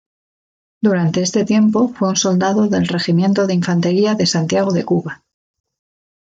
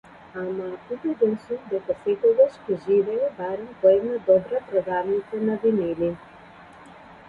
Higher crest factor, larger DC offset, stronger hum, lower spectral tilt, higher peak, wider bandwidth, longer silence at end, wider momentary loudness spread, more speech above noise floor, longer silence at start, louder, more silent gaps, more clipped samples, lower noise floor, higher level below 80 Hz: about the same, 14 dB vs 18 dB; neither; neither; second, -5.5 dB/octave vs -8.5 dB/octave; first, -2 dBFS vs -6 dBFS; first, 7.8 kHz vs 4.9 kHz; first, 1.1 s vs 0.15 s; second, 4 LU vs 12 LU; first, over 75 dB vs 24 dB; first, 0.8 s vs 0.35 s; first, -16 LUFS vs -24 LUFS; neither; neither; first, under -90 dBFS vs -47 dBFS; about the same, -60 dBFS vs -62 dBFS